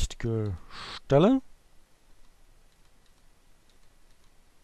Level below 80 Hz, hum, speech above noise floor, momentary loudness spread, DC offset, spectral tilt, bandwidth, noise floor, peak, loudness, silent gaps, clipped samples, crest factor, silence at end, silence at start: -44 dBFS; none; 33 dB; 18 LU; under 0.1%; -7 dB/octave; 12.5 kHz; -58 dBFS; -10 dBFS; -27 LUFS; none; under 0.1%; 22 dB; 3.1 s; 0 s